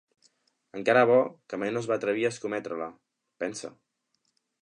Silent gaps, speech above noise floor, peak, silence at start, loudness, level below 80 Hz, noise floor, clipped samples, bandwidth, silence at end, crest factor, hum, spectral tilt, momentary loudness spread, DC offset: none; 50 dB; -8 dBFS; 0.75 s; -27 LUFS; -78 dBFS; -77 dBFS; under 0.1%; 10.5 kHz; 0.95 s; 22 dB; none; -5 dB/octave; 18 LU; under 0.1%